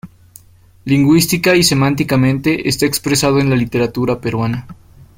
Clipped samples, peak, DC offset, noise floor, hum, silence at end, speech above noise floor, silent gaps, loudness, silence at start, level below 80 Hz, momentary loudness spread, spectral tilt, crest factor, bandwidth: under 0.1%; 0 dBFS; under 0.1%; -46 dBFS; none; 0.45 s; 32 dB; none; -14 LUFS; 0.05 s; -42 dBFS; 8 LU; -5 dB/octave; 14 dB; 16.5 kHz